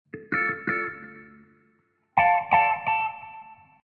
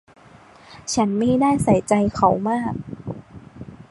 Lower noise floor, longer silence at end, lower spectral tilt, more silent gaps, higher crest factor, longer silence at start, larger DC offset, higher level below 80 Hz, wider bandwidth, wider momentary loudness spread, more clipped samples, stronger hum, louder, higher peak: first, -67 dBFS vs -48 dBFS; first, 0.3 s vs 0.1 s; about the same, -7 dB/octave vs -6 dB/octave; neither; about the same, 22 dB vs 18 dB; second, 0.15 s vs 0.7 s; neither; second, -66 dBFS vs -48 dBFS; second, 4.9 kHz vs 11.5 kHz; about the same, 22 LU vs 20 LU; neither; neither; second, -24 LUFS vs -20 LUFS; about the same, -6 dBFS vs -4 dBFS